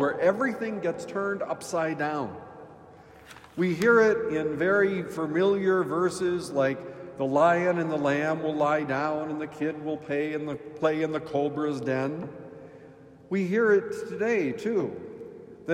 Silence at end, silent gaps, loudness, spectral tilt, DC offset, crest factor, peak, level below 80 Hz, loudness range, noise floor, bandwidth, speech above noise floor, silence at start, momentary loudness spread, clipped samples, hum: 0 s; none; -27 LUFS; -6.5 dB/octave; under 0.1%; 18 dB; -10 dBFS; -66 dBFS; 5 LU; -50 dBFS; 16 kHz; 24 dB; 0 s; 15 LU; under 0.1%; none